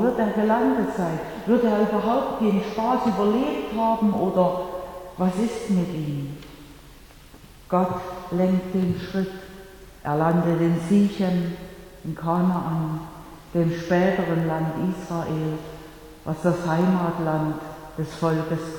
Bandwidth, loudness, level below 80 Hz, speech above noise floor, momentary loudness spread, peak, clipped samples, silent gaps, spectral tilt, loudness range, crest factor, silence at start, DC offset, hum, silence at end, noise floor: 18.5 kHz; -24 LUFS; -50 dBFS; 24 dB; 14 LU; -8 dBFS; under 0.1%; none; -7.5 dB/octave; 5 LU; 16 dB; 0 s; under 0.1%; none; 0 s; -47 dBFS